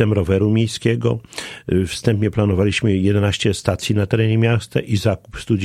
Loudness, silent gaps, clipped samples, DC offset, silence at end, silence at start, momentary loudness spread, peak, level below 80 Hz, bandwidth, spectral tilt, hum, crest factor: -18 LUFS; none; under 0.1%; under 0.1%; 0 s; 0 s; 5 LU; 0 dBFS; -42 dBFS; 13.5 kHz; -6.5 dB/octave; none; 18 dB